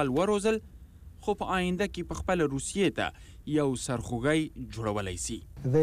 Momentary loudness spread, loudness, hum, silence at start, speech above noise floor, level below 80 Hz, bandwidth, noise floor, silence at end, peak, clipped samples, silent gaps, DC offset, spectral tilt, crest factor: 8 LU; -30 LUFS; none; 0 s; 19 dB; -48 dBFS; 15.5 kHz; -49 dBFS; 0 s; -16 dBFS; under 0.1%; none; under 0.1%; -5 dB/octave; 14 dB